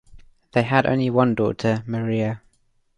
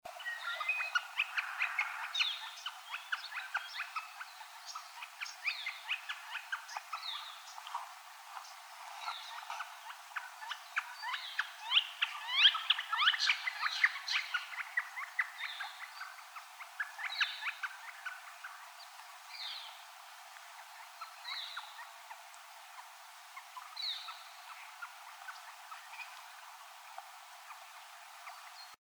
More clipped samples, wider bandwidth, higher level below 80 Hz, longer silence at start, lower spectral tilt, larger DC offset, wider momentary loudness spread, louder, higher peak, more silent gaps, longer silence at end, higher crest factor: neither; second, 10 kHz vs over 20 kHz; first, -52 dBFS vs under -90 dBFS; about the same, 0.1 s vs 0.05 s; first, -8 dB/octave vs 5.5 dB/octave; neither; second, 6 LU vs 20 LU; first, -21 LUFS vs -36 LUFS; first, -4 dBFS vs -14 dBFS; neither; first, 0.6 s vs 0.15 s; second, 18 dB vs 26 dB